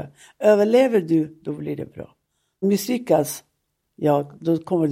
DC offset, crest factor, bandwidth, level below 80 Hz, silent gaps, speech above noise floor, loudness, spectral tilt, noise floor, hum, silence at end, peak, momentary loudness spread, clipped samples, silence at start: under 0.1%; 16 dB; 16.5 kHz; -64 dBFS; none; 53 dB; -21 LUFS; -6 dB/octave; -74 dBFS; none; 0 s; -6 dBFS; 16 LU; under 0.1%; 0 s